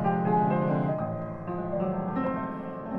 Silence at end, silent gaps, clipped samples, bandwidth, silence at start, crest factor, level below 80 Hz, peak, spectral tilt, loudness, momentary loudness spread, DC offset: 0 s; none; under 0.1%; 4.1 kHz; 0 s; 14 dB; -54 dBFS; -14 dBFS; -11 dB/octave; -29 LUFS; 10 LU; under 0.1%